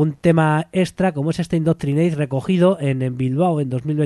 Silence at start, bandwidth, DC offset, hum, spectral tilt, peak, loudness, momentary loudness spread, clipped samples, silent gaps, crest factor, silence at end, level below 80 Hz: 0 s; 12 kHz; under 0.1%; none; -8 dB/octave; -2 dBFS; -19 LUFS; 5 LU; under 0.1%; none; 16 dB; 0 s; -50 dBFS